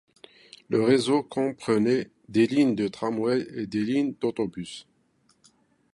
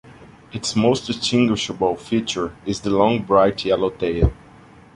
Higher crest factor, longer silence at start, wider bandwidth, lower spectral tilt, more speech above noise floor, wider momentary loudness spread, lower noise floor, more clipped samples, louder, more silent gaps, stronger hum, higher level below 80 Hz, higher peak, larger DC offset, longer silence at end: about the same, 20 dB vs 18 dB; first, 0.7 s vs 0.05 s; about the same, 11.5 kHz vs 11.5 kHz; about the same, -6 dB/octave vs -5.5 dB/octave; first, 42 dB vs 27 dB; about the same, 10 LU vs 9 LU; first, -66 dBFS vs -46 dBFS; neither; second, -25 LUFS vs -20 LUFS; neither; neither; second, -66 dBFS vs -34 dBFS; second, -8 dBFS vs -2 dBFS; neither; first, 1.1 s vs 0.6 s